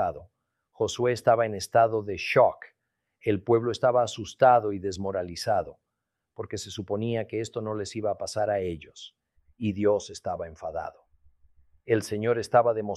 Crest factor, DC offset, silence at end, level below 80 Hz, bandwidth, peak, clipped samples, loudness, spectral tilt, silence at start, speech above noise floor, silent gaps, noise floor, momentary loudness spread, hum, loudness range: 20 dB; under 0.1%; 0 s; -60 dBFS; 13 kHz; -8 dBFS; under 0.1%; -27 LUFS; -5.5 dB/octave; 0 s; 57 dB; none; -83 dBFS; 14 LU; none; 7 LU